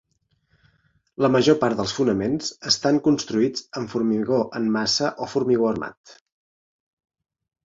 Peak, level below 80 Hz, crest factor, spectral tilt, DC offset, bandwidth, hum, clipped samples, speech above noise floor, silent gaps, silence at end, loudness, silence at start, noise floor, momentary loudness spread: -4 dBFS; -58 dBFS; 20 dB; -4.5 dB/octave; under 0.1%; 7.8 kHz; none; under 0.1%; 46 dB; 5.97-6.04 s; 1.5 s; -22 LUFS; 1.2 s; -68 dBFS; 8 LU